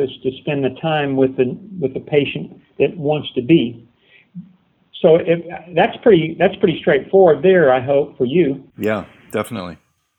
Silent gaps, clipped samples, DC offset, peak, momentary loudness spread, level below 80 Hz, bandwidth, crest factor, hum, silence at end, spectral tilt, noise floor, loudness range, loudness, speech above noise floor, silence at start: none; under 0.1%; under 0.1%; 0 dBFS; 12 LU; -54 dBFS; 15.5 kHz; 18 dB; none; 0.45 s; -7.5 dB/octave; -52 dBFS; 5 LU; -17 LUFS; 36 dB; 0 s